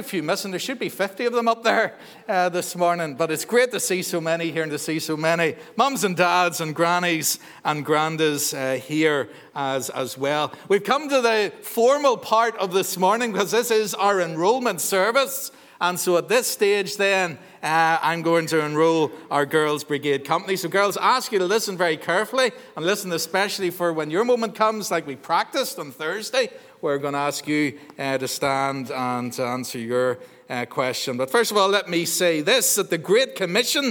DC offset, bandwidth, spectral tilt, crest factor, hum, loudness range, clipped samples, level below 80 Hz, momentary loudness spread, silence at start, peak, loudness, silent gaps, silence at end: under 0.1%; 19.5 kHz; -3 dB/octave; 20 dB; none; 4 LU; under 0.1%; -76 dBFS; 7 LU; 0 s; -4 dBFS; -22 LUFS; none; 0 s